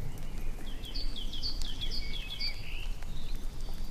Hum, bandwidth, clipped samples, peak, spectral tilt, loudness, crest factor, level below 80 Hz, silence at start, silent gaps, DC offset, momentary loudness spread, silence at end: none; 14 kHz; under 0.1%; -18 dBFS; -3.5 dB/octave; -39 LUFS; 12 dB; -34 dBFS; 0 s; none; under 0.1%; 8 LU; 0 s